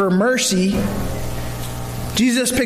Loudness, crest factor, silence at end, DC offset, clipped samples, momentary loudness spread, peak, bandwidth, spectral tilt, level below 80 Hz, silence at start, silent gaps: -19 LUFS; 12 dB; 0 s; under 0.1%; under 0.1%; 11 LU; -6 dBFS; 15.5 kHz; -4.5 dB/octave; -32 dBFS; 0 s; none